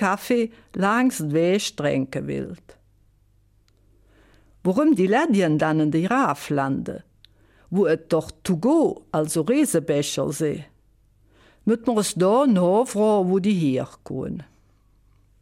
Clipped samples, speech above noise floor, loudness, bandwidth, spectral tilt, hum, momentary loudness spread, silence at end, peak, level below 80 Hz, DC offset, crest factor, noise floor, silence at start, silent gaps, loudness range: under 0.1%; 38 dB; -22 LUFS; 16 kHz; -5.5 dB/octave; none; 11 LU; 1 s; -8 dBFS; -58 dBFS; under 0.1%; 14 dB; -60 dBFS; 0 s; none; 4 LU